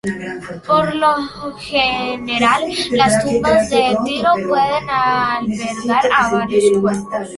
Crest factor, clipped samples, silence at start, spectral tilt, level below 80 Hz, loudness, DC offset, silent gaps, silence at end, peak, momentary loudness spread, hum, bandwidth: 16 dB; under 0.1%; 0.05 s; -4 dB/octave; -46 dBFS; -16 LUFS; under 0.1%; none; 0 s; 0 dBFS; 8 LU; none; 11.5 kHz